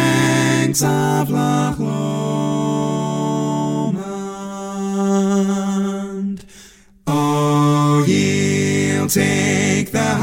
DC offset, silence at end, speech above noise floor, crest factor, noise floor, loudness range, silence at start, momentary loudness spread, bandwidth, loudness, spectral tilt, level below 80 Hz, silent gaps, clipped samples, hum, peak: under 0.1%; 0 s; 28 dB; 18 dB; -45 dBFS; 5 LU; 0 s; 10 LU; 16.5 kHz; -18 LUFS; -5.5 dB/octave; -50 dBFS; none; under 0.1%; none; 0 dBFS